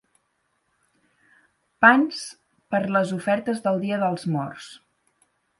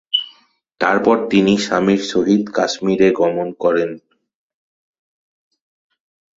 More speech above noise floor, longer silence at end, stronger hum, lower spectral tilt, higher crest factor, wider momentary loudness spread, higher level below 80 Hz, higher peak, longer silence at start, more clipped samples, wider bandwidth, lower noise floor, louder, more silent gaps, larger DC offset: first, 50 dB vs 39 dB; second, 0.85 s vs 2.4 s; neither; about the same, -5.5 dB/octave vs -5 dB/octave; first, 24 dB vs 18 dB; first, 18 LU vs 6 LU; second, -70 dBFS vs -56 dBFS; about the same, -2 dBFS vs 0 dBFS; first, 1.8 s vs 0.15 s; neither; first, 11.5 kHz vs 7.8 kHz; first, -72 dBFS vs -54 dBFS; second, -22 LUFS vs -16 LUFS; neither; neither